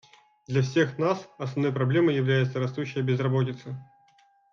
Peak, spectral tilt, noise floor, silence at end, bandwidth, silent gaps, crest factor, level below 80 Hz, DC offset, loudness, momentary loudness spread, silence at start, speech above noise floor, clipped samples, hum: -10 dBFS; -7.5 dB/octave; -62 dBFS; 0.7 s; 7 kHz; none; 16 dB; -68 dBFS; under 0.1%; -26 LUFS; 9 LU; 0.5 s; 36 dB; under 0.1%; none